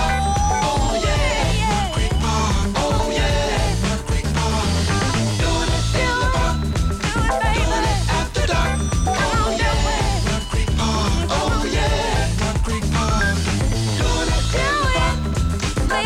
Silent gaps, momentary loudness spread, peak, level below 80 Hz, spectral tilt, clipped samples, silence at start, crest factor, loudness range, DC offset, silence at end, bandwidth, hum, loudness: none; 3 LU; -6 dBFS; -24 dBFS; -4.5 dB/octave; under 0.1%; 0 s; 12 dB; 1 LU; under 0.1%; 0 s; 15.5 kHz; none; -20 LUFS